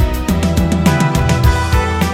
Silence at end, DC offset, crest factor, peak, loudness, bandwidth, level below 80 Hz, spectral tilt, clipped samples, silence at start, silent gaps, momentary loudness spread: 0 s; 0.5%; 12 dB; 0 dBFS; -14 LUFS; 17 kHz; -18 dBFS; -6 dB/octave; under 0.1%; 0 s; none; 3 LU